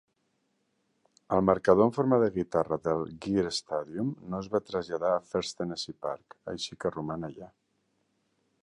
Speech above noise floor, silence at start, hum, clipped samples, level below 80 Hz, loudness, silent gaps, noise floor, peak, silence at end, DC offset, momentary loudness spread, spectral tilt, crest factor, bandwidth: 47 dB; 1.3 s; none; under 0.1%; -60 dBFS; -29 LUFS; none; -76 dBFS; -8 dBFS; 1.2 s; under 0.1%; 14 LU; -6 dB/octave; 22 dB; 11 kHz